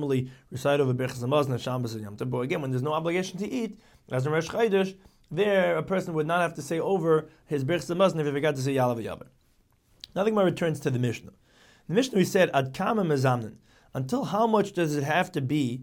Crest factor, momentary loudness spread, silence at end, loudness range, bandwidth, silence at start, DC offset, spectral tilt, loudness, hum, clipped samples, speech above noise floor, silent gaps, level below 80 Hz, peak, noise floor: 18 dB; 9 LU; 0 s; 3 LU; 17 kHz; 0 s; under 0.1%; -6 dB/octave; -27 LUFS; none; under 0.1%; 38 dB; none; -62 dBFS; -8 dBFS; -65 dBFS